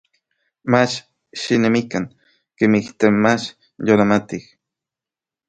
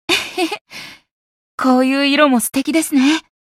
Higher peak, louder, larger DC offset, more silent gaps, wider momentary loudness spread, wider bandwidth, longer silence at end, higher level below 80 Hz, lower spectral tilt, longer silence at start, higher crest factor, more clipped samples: about the same, 0 dBFS vs 0 dBFS; second, -18 LUFS vs -15 LUFS; neither; second, none vs 0.61-0.65 s, 1.11-1.58 s; second, 16 LU vs 20 LU; second, 9 kHz vs 16 kHz; first, 1.05 s vs 0.25 s; about the same, -56 dBFS vs -58 dBFS; first, -5.5 dB/octave vs -2.5 dB/octave; first, 0.65 s vs 0.1 s; about the same, 20 dB vs 16 dB; neither